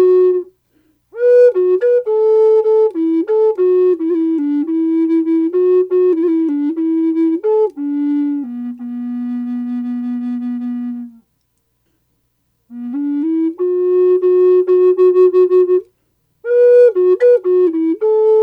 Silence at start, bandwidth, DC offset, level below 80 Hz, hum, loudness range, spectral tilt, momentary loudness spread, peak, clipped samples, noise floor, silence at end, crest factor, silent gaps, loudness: 0 s; 4.6 kHz; under 0.1%; -70 dBFS; none; 11 LU; -7.5 dB/octave; 11 LU; -2 dBFS; under 0.1%; -65 dBFS; 0 s; 10 dB; none; -14 LUFS